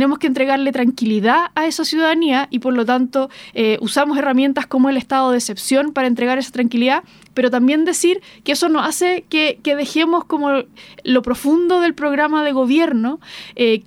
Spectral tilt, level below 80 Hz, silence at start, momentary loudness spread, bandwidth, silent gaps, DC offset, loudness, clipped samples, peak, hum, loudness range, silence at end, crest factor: -3.5 dB/octave; -56 dBFS; 0 s; 5 LU; 16 kHz; none; under 0.1%; -17 LUFS; under 0.1%; -2 dBFS; none; 1 LU; 0.05 s; 14 dB